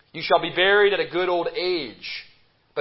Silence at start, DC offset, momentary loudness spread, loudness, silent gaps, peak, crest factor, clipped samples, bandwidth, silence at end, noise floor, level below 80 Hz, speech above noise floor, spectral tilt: 0.15 s; under 0.1%; 16 LU; -21 LUFS; none; -4 dBFS; 18 dB; under 0.1%; 5.8 kHz; 0 s; -44 dBFS; -60 dBFS; 22 dB; -8 dB/octave